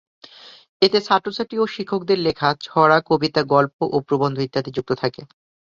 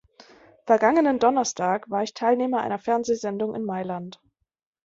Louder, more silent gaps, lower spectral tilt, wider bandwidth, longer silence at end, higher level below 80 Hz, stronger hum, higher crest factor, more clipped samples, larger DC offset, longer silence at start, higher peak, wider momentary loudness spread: first, -20 LUFS vs -23 LUFS; first, 0.69-0.80 s, 3.73-3.79 s vs none; first, -6.5 dB/octave vs -4.5 dB/octave; about the same, 7.4 kHz vs 7.8 kHz; second, 0.5 s vs 0.75 s; first, -58 dBFS vs -66 dBFS; neither; about the same, 20 dB vs 20 dB; neither; neither; second, 0.45 s vs 0.65 s; first, 0 dBFS vs -4 dBFS; about the same, 9 LU vs 11 LU